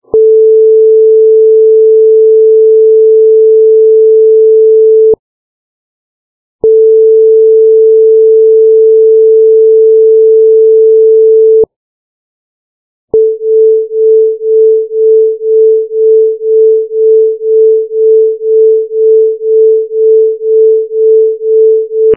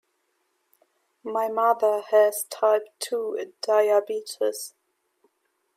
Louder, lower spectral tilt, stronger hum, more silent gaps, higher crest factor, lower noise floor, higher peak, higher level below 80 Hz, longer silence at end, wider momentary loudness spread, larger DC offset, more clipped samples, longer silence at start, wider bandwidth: first, -6 LUFS vs -24 LUFS; first, -11 dB/octave vs -1.5 dB/octave; neither; first, 5.19-6.59 s, 11.76-13.08 s vs none; second, 6 dB vs 18 dB; first, under -90 dBFS vs -73 dBFS; first, 0 dBFS vs -8 dBFS; first, -56 dBFS vs -86 dBFS; second, 0 s vs 1.1 s; second, 4 LU vs 11 LU; neither; neither; second, 0.15 s vs 1.25 s; second, 0.9 kHz vs 16 kHz